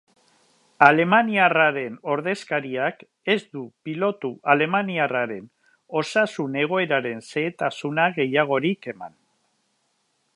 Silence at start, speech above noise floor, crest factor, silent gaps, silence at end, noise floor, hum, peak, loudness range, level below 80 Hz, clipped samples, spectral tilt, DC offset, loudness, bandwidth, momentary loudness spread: 0.8 s; 48 dB; 24 dB; none; 1.3 s; -70 dBFS; none; 0 dBFS; 4 LU; -76 dBFS; under 0.1%; -5.5 dB/octave; under 0.1%; -22 LUFS; 11.5 kHz; 14 LU